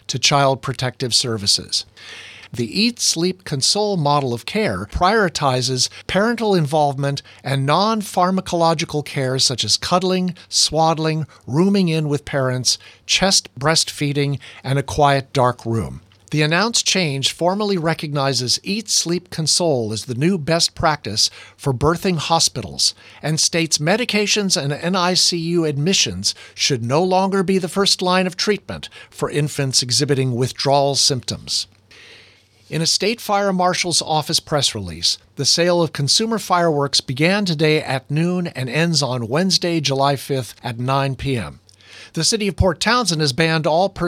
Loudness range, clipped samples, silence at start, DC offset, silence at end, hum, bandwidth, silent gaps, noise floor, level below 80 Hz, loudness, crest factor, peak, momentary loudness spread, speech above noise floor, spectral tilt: 2 LU; under 0.1%; 0.1 s; under 0.1%; 0 s; none; 16 kHz; none; -50 dBFS; -44 dBFS; -18 LUFS; 18 dB; -2 dBFS; 8 LU; 32 dB; -3.5 dB/octave